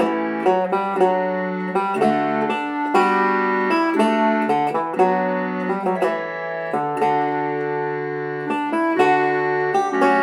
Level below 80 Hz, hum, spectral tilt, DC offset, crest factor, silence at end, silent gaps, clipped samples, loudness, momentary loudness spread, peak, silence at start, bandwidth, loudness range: -66 dBFS; none; -6.5 dB/octave; under 0.1%; 16 dB; 0 s; none; under 0.1%; -20 LUFS; 6 LU; -4 dBFS; 0 s; 12 kHz; 3 LU